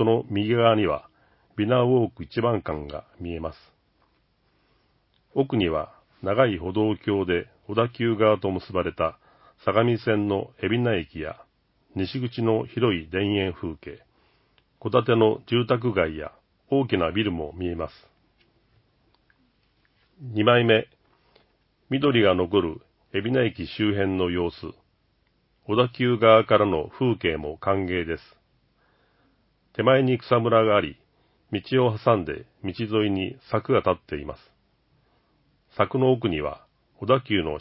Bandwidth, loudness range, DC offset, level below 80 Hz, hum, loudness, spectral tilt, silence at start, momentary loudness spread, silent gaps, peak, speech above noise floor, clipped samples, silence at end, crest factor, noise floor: 5.8 kHz; 6 LU; under 0.1%; -48 dBFS; none; -24 LUFS; -11 dB/octave; 0 s; 15 LU; none; -2 dBFS; 44 dB; under 0.1%; 0 s; 22 dB; -67 dBFS